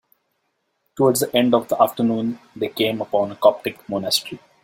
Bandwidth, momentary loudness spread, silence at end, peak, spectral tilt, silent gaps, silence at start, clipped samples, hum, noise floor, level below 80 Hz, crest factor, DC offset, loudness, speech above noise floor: 16.5 kHz; 10 LU; 0.25 s; -2 dBFS; -4.5 dB/octave; none; 0.95 s; under 0.1%; none; -72 dBFS; -62 dBFS; 20 dB; under 0.1%; -20 LUFS; 52 dB